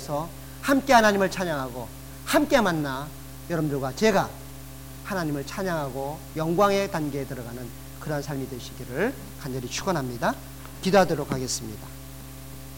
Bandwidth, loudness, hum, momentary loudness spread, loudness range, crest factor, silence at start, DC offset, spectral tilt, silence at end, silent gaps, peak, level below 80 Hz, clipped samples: 19 kHz; -26 LUFS; none; 19 LU; 7 LU; 22 dB; 0 s; 0.4%; -5 dB/octave; 0 s; none; -6 dBFS; -46 dBFS; under 0.1%